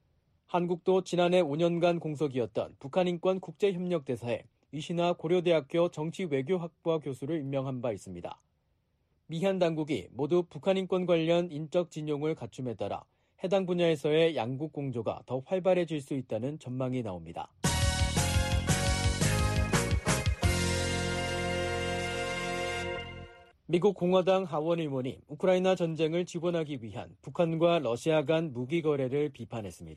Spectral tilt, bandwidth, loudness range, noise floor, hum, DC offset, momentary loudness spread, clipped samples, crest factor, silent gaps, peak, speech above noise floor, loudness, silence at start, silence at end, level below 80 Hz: -5.5 dB/octave; 13 kHz; 4 LU; -74 dBFS; none; under 0.1%; 10 LU; under 0.1%; 16 dB; none; -14 dBFS; 44 dB; -30 LUFS; 0.5 s; 0 s; -44 dBFS